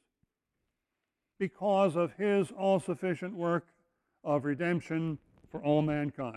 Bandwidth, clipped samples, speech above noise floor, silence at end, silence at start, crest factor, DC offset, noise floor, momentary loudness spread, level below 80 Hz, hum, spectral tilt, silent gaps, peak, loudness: 11.5 kHz; under 0.1%; 56 dB; 0 s; 1.4 s; 18 dB; under 0.1%; -86 dBFS; 10 LU; -68 dBFS; none; -7.5 dB/octave; none; -16 dBFS; -31 LUFS